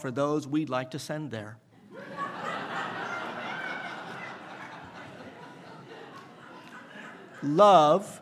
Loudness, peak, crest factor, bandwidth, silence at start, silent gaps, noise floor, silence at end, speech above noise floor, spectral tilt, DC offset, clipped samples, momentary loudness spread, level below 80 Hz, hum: -27 LUFS; -6 dBFS; 24 dB; 13.5 kHz; 0 s; none; -48 dBFS; 0 s; 23 dB; -5.5 dB/octave; under 0.1%; under 0.1%; 25 LU; -80 dBFS; none